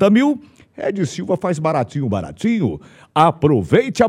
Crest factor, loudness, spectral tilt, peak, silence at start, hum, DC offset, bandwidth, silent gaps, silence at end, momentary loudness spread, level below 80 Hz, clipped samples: 16 dB; -18 LUFS; -7 dB/octave; 0 dBFS; 0 s; none; under 0.1%; 12 kHz; none; 0 s; 10 LU; -50 dBFS; under 0.1%